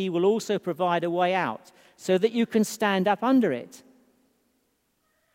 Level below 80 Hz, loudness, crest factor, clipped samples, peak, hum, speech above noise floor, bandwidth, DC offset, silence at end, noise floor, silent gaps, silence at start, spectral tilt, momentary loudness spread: -78 dBFS; -25 LUFS; 18 dB; under 0.1%; -8 dBFS; none; 47 dB; 16 kHz; under 0.1%; 1.6 s; -72 dBFS; none; 0 s; -5.5 dB/octave; 11 LU